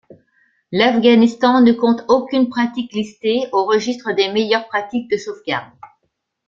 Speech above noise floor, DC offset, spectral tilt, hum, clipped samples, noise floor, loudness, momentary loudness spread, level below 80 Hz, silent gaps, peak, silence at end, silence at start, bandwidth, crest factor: 55 dB; under 0.1%; -5 dB/octave; none; under 0.1%; -71 dBFS; -17 LUFS; 11 LU; -60 dBFS; none; -2 dBFS; 0.6 s; 0.7 s; 7.4 kHz; 16 dB